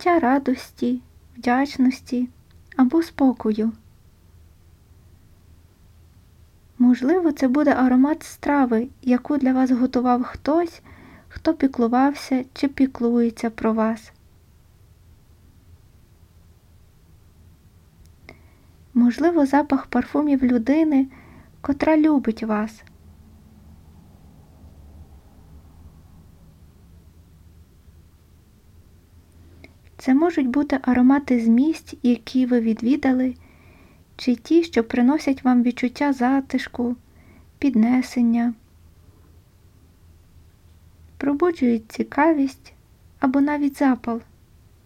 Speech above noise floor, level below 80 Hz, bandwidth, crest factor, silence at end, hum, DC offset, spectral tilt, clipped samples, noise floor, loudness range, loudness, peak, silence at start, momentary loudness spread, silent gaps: 33 dB; -52 dBFS; 12.5 kHz; 18 dB; 0.65 s; none; under 0.1%; -6.5 dB/octave; under 0.1%; -53 dBFS; 8 LU; -21 LUFS; -6 dBFS; 0 s; 9 LU; none